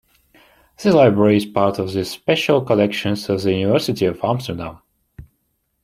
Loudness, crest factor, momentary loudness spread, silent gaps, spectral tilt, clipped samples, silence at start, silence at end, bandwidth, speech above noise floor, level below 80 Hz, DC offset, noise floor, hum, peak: -18 LUFS; 16 dB; 10 LU; none; -6.5 dB/octave; under 0.1%; 0.8 s; 0.65 s; 15.5 kHz; 52 dB; -52 dBFS; under 0.1%; -69 dBFS; none; -2 dBFS